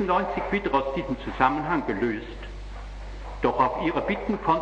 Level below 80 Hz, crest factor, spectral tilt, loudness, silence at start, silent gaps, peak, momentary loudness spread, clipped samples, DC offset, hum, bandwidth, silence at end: -40 dBFS; 20 dB; -7 dB/octave; -26 LUFS; 0 s; none; -6 dBFS; 16 LU; under 0.1%; under 0.1%; none; 9 kHz; 0 s